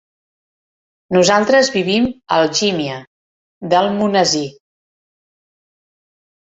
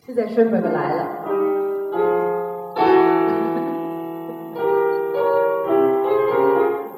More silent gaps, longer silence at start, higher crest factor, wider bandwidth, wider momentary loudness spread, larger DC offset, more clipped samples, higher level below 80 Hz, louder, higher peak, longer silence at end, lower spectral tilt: first, 3.07-3.61 s vs none; first, 1.1 s vs 0.1 s; about the same, 18 dB vs 16 dB; second, 8.2 kHz vs 15 kHz; first, 12 LU vs 9 LU; neither; neither; first, -54 dBFS vs -66 dBFS; first, -15 LUFS vs -20 LUFS; first, 0 dBFS vs -4 dBFS; first, 2 s vs 0 s; second, -3.5 dB/octave vs -8.5 dB/octave